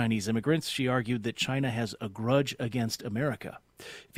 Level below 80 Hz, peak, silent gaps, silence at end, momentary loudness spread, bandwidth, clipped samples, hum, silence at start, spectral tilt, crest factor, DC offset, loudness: -62 dBFS; -12 dBFS; none; 0 s; 13 LU; 16 kHz; under 0.1%; none; 0 s; -5.5 dB/octave; 18 dB; under 0.1%; -30 LUFS